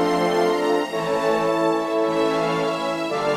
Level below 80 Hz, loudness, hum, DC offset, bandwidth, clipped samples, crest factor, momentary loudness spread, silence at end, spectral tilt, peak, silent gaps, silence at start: -58 dBFS; -21 LUFS; none; under 0.1%; 15.5 kHz; under 0.1%; 12 dB; 4 LU; 0 s; -5 dB/octave; -8 dBFS; none; 0 s